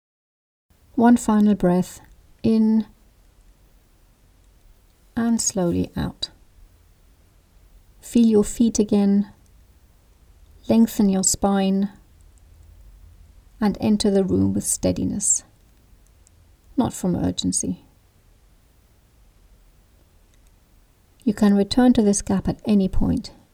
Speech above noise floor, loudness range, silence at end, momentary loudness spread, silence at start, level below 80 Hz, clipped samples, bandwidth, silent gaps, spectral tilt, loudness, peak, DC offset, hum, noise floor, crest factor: 37 dB; 6 LU; 0.25 s; 11 LU; 0.95 s; -40 dBFS; under 0.1%; 15.5 kHz; none; -5 dB/octave; -20 LUFS; -6 dBFS; under 0.1%; none; -56 dBFS; 18 dB